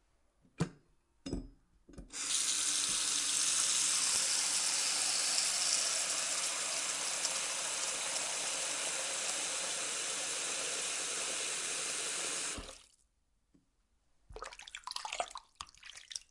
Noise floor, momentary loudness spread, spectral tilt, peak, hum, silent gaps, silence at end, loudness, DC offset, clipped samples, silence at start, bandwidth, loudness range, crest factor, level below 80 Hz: -76 dBFS; 16 LU; 0.5 dB/octave; -14 dBFS; none; none; 0.1 s; -32 LUFS; under 0.1%; under 0.1%; 0.6 s; 11.5 kHz; 12 LU; 24 dB; -62 dBFS